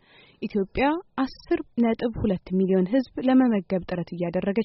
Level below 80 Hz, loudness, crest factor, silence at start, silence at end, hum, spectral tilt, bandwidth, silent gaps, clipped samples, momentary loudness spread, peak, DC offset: -48 dBFS; -25 LUFS; 16 dB; 0.4 s; 0 s; none; -6.5 dB/octave; 5.8 kHz; none; under 0.1%; 9 LU; -10 dBFS; under 0.1%